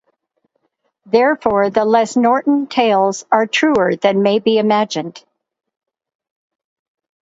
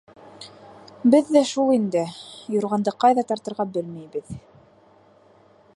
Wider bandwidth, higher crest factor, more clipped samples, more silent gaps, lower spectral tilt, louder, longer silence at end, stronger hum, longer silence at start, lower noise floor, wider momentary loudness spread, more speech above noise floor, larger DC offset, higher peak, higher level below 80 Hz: second, 8 kHz vs 11.5 kHz; about the same, 16 dB vs 20 dB; neither; neither; about the same, -5 dB/octave vs -6 dB/octave; first, -15 LUFS vs -22 LUFS; first, 2.05 s vs 1.35 s; neither; first, 1.1 s vs 0.4 s; first, -67 dBFS vs -54 dBFS; second, 3 LU vs 22 LU; first, 53 dB vs 33 dB; neither; first, 0 dBFS vs -4 dBFS; first, -58 dBFS vs -64 dBFS